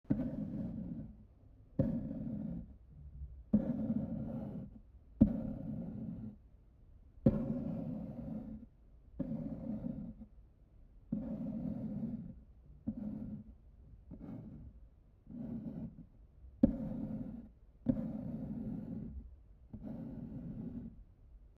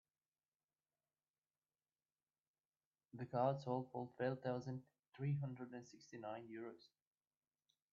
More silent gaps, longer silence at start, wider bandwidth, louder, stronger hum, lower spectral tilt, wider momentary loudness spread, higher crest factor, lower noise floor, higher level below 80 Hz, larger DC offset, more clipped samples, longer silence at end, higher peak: neither; second, 0.1 s vs 3.15 s; second, 3.4 kHz vs 7.2 kHz; first, -41 LUFS vs -46 LUFS; neither; first, -12 dB/octave vs -7.5 dB/octave; first, 24 LU vs 16 LU; first, 28 dB vs 22 dB; second, -61 dBFS vs under -90 dBFS; first, -54 dBFS vs -88 dBFS; neither; neither; second, 0.05 s vs 1.15 s; first, -12 dBFS vs -26 dBFS